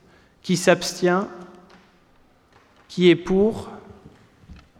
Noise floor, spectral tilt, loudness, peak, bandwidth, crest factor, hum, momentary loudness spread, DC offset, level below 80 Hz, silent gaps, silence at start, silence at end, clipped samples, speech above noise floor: -57 dBFS; -5 dB/octave; -20 LUFS; -4 dBFS; 16 kHz; 20 dB; none; 21 LU; under 0.1%; -50 dBFS; none; 0.45 s; 0.25 s; under 0.1%; 37 dB